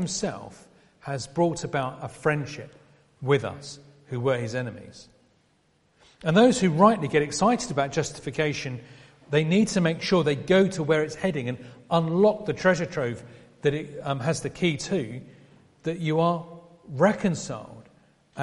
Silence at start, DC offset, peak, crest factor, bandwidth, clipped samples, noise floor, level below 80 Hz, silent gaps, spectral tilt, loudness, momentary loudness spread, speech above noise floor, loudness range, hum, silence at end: 0 s; under 0.1%; -4 dBFS; 22 dB; 11.5 kHz; under 0.1%; -66 dBFS; -58 dBFS; none; -5.5 dB/octave; -25 LUFS; 18 LU; 41 dB; 6 LU; none; 0 s